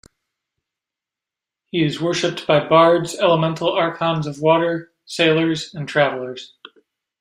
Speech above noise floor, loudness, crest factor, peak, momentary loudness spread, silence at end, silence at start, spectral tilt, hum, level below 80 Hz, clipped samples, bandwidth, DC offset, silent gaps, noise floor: 69 dB; -18 LUFS; 18 dB; -2 dBFS; 13 LU; 0.75 s; 1.75 s; -5.5 dB/octave; none; -60 dBFS; under 0.1%; 13 kHz; under 0.1%; none; -87 dBFS